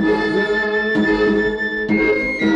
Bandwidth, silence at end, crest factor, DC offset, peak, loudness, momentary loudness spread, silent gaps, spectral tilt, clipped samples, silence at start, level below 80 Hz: 9.2 kHz; 0 s; 12 dB; under 0.1%; -6 dBFS; -17 LUFS; 3 LU; none; -6.5 dB/octave; under 0.1%; 0 s; -40 dBFS